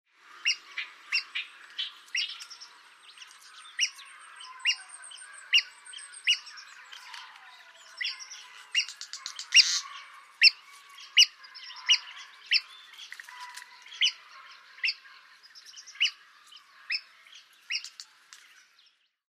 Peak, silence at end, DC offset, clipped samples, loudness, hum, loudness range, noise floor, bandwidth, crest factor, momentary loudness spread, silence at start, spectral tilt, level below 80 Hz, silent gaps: -6 dBFS; 1.35 s; under 0.1%; under 0.1%; -26 LUFS; none; 11 LU; -65 dBFS; 15.5 kHz; 26 dB; 27 LU; 0.45 s; 7 dB/octave; under -90 dBFS; none